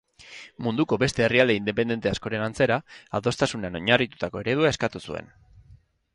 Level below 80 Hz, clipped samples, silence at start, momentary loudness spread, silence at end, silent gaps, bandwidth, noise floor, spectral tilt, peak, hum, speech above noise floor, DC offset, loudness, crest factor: -52 dBFS; under 0.1%; 0.2 s; 14 LU; 0.9 s; none; 11.5 kHz; -55 dBFS; -5 dB/octave; -2 dBFS; none; 30 dB; under 0.1%; -24 LUFS; 24 dB